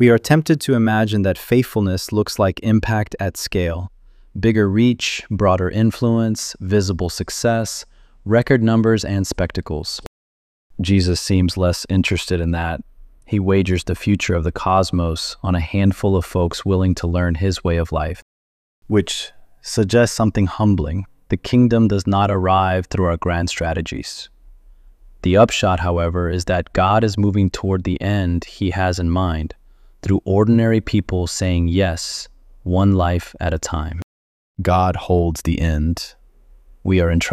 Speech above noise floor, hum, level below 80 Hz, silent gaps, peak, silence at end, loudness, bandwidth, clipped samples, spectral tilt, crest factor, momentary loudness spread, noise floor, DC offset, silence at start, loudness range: 30 dB; none; -34 dBFS; 10.07-10.70 s, 18.22-18.82 s, 34.03-34.55 s; -2 dBFS; 0 s; -18 LUFS; 15.5 kHz; under 0.1%; -6 dB/octave; 18 dB; 11 LU; -48 dBFS; under 0.1%; 0 s; 3 LU